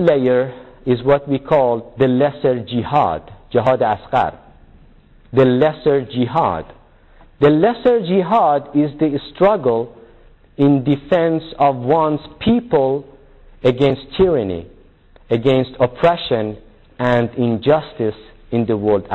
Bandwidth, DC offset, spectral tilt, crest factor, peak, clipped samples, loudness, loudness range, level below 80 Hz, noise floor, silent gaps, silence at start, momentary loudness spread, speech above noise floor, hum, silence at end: 7.6 kHz; under 0.1%; -9 dB/octave; 14 dB; -4 dBFS; under 0.1%; -17 LUFS; 2 LU; -44 dBFS; -47 dBFS; none; 0 s; 8 LU; 31 dB; none; 0 s